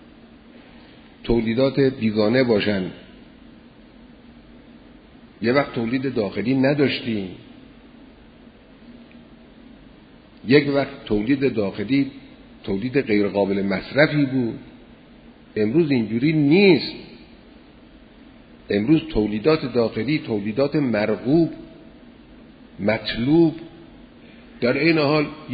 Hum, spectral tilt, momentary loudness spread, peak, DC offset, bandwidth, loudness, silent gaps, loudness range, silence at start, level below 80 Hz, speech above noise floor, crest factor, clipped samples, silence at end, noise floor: none; -10 dB/octave; 11 LU; 0 dBFS; under 0.1%; 5 kHz; -21 LUFS; none; 5 LU; 1.25 s; -48 dBFS; 28 dB; 22 dB; under 0.1%; 0 s; -47 dBFS